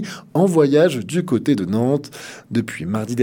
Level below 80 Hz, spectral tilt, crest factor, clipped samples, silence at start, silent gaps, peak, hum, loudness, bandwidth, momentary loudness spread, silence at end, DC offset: -62 dBFS; -6.5 dB/octave; 16 dB; under 0.1%; 0 s; none; -2 dBFS; none; -19 LUFS; 17.5 kHz; 10 LU; 0 s; under 0.1%